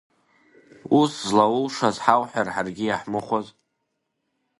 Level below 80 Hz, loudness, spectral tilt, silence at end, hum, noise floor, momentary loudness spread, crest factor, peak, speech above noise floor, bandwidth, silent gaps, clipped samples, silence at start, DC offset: -64 dBFS; -22 LUFS; -5 dB/octave; 1.1 s; none; -77 dBFS; 8 LU; 24 dB; 0 dBFS; 55 dB; 11.5 kHz; none; under 0.1%; 0.85 s; under 0.1%